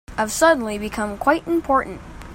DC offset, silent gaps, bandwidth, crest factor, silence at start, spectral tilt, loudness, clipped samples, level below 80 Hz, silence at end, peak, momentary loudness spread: under 0.1%; none; 16.5 kHz; 18 dB; 0.1 s; -4 dB/octave; -20 LUFS; under 0.1%; -42 dBFS; 0 s; -2 dBFS; 10 LU